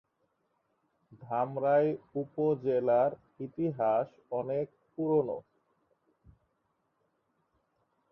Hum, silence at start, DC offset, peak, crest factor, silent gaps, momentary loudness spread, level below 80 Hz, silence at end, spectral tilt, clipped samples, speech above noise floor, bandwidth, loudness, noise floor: none; 1.1 s; under 0.1%; -16 dBFS; 18 dB; none; 11 LU; -74 dBFS; 2.7 s; -10.5 dB/octave; under 0.1%; 48 dB; 5.6 kHz; -31 LUFS; -78 dBFS